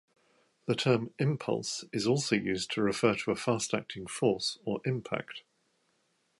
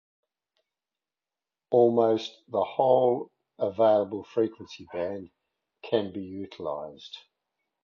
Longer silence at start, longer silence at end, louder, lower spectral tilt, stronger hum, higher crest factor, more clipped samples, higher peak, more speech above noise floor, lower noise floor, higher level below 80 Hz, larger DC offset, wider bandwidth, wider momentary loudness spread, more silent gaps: second, 0.65 s vs 1.7 s; first, 1 s vs 0.65 s; second, -31 LUFS vs -27 LUFS; second, -5 dB/octave vs -7 dB/octave; neither; about the same, 22 dB vs 22 dB; neither; second, -12 dBFS vs -8 dBFS; second, 43 dB vs over 64 dB; second, -74 dBFS vs under -90 dBFS; about the same, -68 dBFS vs -68 dBFS; neither; first, 11.5 kHz vs 7 kHz; second, 9 LU vs 20 LU; neither